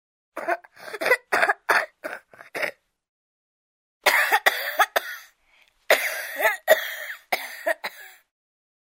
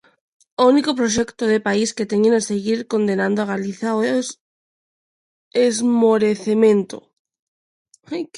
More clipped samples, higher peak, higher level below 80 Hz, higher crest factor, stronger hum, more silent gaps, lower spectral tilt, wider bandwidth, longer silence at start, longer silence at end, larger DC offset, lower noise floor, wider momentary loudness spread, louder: neither; about the same, -2 dBFS vs -2 dBFS; second, -78 dBFS vs -58 dBFS; first, 24 dB vs 16 dB; neither; second, 3.09-4.01 s vs 4.40-5.51 s, 7.19-7.25 s, 7.39-7.85 s; second, 0 dB/octave vs -4.5 dB/octave; first, 16.5 kHz vs 11.5 kHz; second, 0.35 s vs 0.6 s; first, 0.85 s vs 0 s; neither; second, -61 dBFS vs under -90 dBFS; first, 17 LU vs 9 LU; second, -23 LUFS vs -18 LUFS